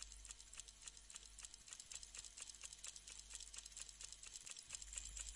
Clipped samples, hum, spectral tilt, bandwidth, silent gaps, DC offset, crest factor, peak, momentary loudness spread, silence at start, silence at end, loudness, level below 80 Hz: under 0.1%; none; 0.5 dB/octave; 11.5 kHz; none; under 0.1%; 26 dB; -30 dBFS; 6 LU; 0 s; 0 s; -53 LUFS; -66 dBFS